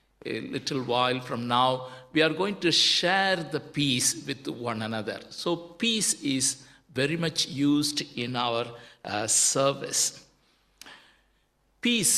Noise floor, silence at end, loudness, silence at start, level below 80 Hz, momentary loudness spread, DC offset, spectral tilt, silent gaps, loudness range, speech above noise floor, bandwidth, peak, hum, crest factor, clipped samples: -69 dBFS; 0 s; -26 LUFS; 0.25 s; -68 dBFS; 12 LU; under 0.1%; -2.5 dB/octave; none; 3 LU; 42 dB; 14.5 kHz; -8 dBFS; none; 20 dB; under 0.1%